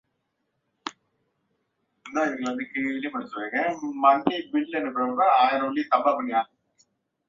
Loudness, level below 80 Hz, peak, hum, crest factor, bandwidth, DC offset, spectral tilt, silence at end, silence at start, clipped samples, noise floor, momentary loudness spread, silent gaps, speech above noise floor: -25 LUFS; -72 dBFS; -6 dBFS; none; 20 dB; 7.6 kHz; under 0.1%; -4.5 dB/octave; 0.85 s; 0.85 s; under 0.1%; -77 dBFS; 12 LU; none; 53 dB